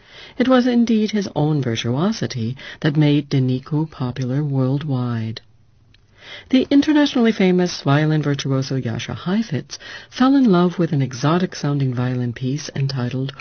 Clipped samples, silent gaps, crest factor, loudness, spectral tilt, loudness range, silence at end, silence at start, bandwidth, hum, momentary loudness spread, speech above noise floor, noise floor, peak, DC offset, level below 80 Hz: under 0.1%; none; 16 dB; -19 LUFS; -6.5 dB/octave; 3 LU; 0 s; 0.15 s; 6.6 kHz; none; 11 LU; 35 dB; -54 dBFS; -2 dBFS; 0.1%; -54 dBFS